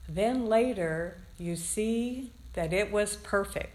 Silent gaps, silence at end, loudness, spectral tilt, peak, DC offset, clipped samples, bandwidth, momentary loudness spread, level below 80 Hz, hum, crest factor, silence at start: none; 0 s; -30 LUFS; -4.5 dB/octave; -14 dBFS; under 0.1%; under 0.1%; 15 kHz; 13 LU; -48 dBFS; none; 16 dB; 0 s